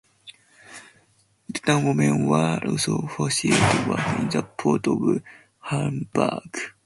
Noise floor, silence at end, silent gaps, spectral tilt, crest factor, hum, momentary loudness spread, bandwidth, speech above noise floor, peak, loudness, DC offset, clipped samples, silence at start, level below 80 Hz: -62 dBFS; 0.15 s; none; -5 dB/octave; 20 dB; none; 14 LU; 11.5 kHz; 40 dB; -4 dBFS; -23 LUFS; under 0.1%; under 0.1%; 0.25 s; -54 dBFS